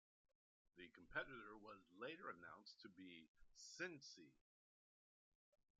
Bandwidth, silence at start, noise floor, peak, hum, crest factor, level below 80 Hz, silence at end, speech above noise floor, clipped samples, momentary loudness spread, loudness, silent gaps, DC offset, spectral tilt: 7.4 kHz; 0.75 s; under -90 dBFS; -34 dBFS; none; 26 dB; -82 dBFS; 1.4 s; over 33 dB; under 0.1%; 13 LU; -57 LUFS; 3.28-3.34 s; under 0.1%; -1.5 dB/octave